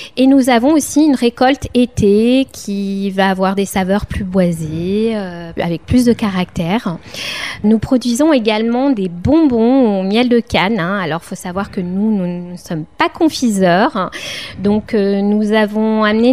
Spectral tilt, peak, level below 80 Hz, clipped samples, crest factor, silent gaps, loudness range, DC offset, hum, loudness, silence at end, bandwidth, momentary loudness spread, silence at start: -5.5 dB/octave; 0 dBFS; -38 dBFS; under 0.1%; 14 dB; none; 4 LU; 0.5%; none; -14 LUFS; 0 s; 15.5 kHz; 10 LU; 0 s